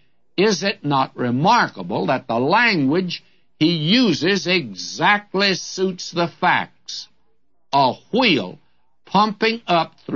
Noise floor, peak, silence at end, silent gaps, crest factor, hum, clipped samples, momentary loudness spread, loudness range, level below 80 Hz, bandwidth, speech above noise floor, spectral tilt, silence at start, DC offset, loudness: -70 dBFS; -4 dBFS; 0 s; none; 16 dB; none; under 0.1%; 9 LU; 3 LU; -66 dBFS; 7.4 kHz; 51 dB; -4.5 dB/octave; 0.4 s; 0.2%; -19 LUFS